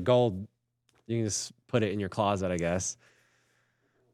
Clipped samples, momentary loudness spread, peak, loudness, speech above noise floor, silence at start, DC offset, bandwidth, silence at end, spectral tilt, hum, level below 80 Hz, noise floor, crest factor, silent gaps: under 0.1%; 11 LU; -12 dBFS; -30 LUFS; 43 dB; 0 s; under 0.1%; 13.5 kHz; 1.2 s; -5 dB/octave; none; -66 dBFS; -72 dBFS; 20 dB; none